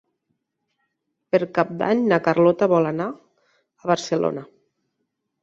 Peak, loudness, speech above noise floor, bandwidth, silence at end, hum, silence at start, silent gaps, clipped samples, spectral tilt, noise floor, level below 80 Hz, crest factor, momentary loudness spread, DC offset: -4 dBFS; -21 LUFS; 57 dB; 7.8 kHz; 1 s; none; 1.35 s; none; under 0.1%; -6.5 dB/octave; -77 dBFS; -66 dBFS; 20 dB; 11 LU; under 0.1%